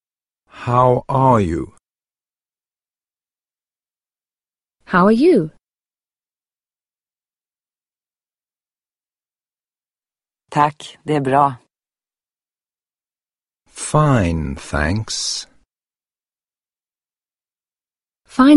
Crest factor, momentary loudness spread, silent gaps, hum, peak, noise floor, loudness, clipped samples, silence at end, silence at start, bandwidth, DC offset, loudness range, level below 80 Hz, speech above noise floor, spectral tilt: 20 dB; 14 LU; none; none; 0 dBFS; under -90 dBFS; -17 LUFS; under 0.1%; 0 s; 0.55 s; 11.5 kHz; under 0.1%; 7 LU; -42 dBFS; over 74 dB; -6 dB/octave